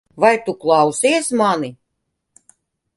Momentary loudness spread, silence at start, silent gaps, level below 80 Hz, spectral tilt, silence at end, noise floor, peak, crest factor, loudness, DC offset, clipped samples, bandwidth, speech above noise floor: 6 LU; 0.15 s; none; -64 dBFS; -3.5 dB/octave; 1.25 s; -74 dBFS; 0 dBFS; 18 dB; -16 LUFS; under 0.1%; under 0.1%; 11.5 kHz; 59 dB